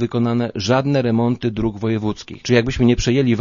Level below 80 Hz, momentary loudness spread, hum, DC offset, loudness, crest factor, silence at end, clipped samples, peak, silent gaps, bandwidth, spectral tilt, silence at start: -36 dBFS; 6 LU; none; under 0.1%; -19 LUFS; 18 dB; 0 s; under 0.1%; 0 dBFS; none; 7.4 kHz; -6.5 dB/octave; 0 s